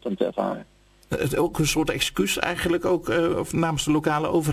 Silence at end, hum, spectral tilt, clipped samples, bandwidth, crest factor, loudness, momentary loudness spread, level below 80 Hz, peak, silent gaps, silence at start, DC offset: 0 s; none; -4.5 dB/octave; under 0.1%; 16 kHz; 20 dB; -24 LUFS; 6 LU; -44 dBFS; -4 dBFS; none; 0.05 s; under 0.1%